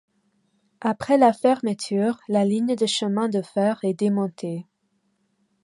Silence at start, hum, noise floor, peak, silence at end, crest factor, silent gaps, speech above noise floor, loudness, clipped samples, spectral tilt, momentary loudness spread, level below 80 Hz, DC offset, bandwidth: 0.8 s; none; -70 dBFS; -4 dBFS; 1 s; 18 dB; none; 49 dB; -23 LUFS; under 0.1%; -5.5 dB/octave; 10 LU; -68 dBFS; under 0.1%; 11.5 kHz